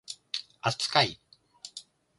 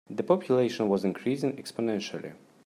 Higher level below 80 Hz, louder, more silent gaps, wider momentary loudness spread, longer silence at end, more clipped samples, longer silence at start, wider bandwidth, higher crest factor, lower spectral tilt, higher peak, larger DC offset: first, -68 dBFS vs -74 dBFS; about the same, -28 LUFS vs -28 LUFS; neither; first, 22 LU vs 11 LU; about the same, 0.4 s vs 0.3 s; neither; about the same, 0.1 s vs 0.1 s; second, 11.5 kHz vs 14 kHz; first, 28 dB vs 18 dB; second, -3 dB/octave vs -6.5 dB/octave; first, -4 dBFS vs -10 dBFS; neither